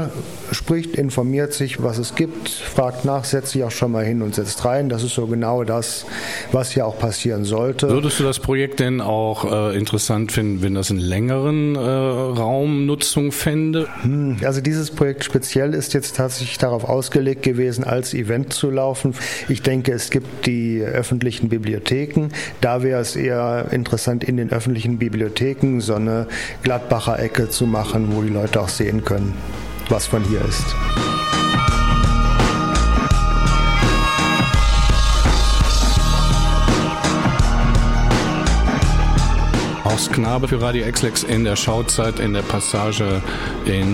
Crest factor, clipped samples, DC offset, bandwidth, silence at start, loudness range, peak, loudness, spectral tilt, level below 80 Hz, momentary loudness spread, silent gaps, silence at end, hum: 16 dB; under 0.1%; 0.4%; 16.5 kHz; 0 s; 4 LU; -2 dBFS; -19 LUFS; -5 dB/octave; -24 dBFS; 5 LU; none; 0 s; none